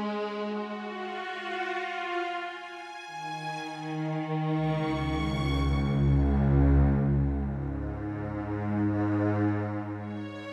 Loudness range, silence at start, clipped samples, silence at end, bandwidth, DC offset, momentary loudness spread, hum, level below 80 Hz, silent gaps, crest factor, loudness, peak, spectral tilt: 8 LU; 0 s; under 0.1%; 0 s; 9 kHz; under 0.1%; 11 LU; none; -36 dBFS; none; 16 dB; -30 LUFS; -14 dBFS; -8 dB/octave